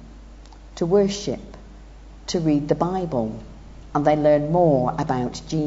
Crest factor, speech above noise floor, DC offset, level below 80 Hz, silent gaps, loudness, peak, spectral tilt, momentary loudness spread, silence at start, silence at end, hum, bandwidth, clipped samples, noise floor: 18 dB; 22 dB; under 0.1%; -42 dBFS; none; -22 LUFS; -4 dBFS; -6.5 dB/octave; 18 LU; 0 s; 0 s; none; 8 kHz; under 0.1%; -42 dBFS